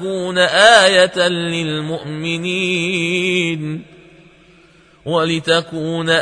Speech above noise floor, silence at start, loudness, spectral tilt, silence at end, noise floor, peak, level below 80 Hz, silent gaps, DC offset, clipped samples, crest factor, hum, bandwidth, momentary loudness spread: 33 dB; 0 s; -15 LUFS; -3.5 dB/octave; 0 s; -48 dBFS; 0 dBFS; -56 dBFS; none; under 0.1%; under 0.1%; 16 dB; none; 10.5 kHz; 14 LU